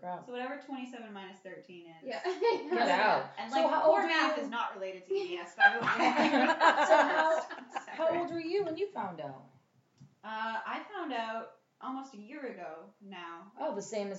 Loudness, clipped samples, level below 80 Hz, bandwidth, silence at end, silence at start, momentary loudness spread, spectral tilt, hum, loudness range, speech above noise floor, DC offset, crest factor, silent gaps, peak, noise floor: -30 LUFS; under 0.1%; under -90 dBFS; 8 kHz; 0 s; 0 s; 21 LU; -4 dB/octave; none; 13 LU; 35 dB; under 0.1%; 22 dB; none; -10 dBFS; -67 dBFS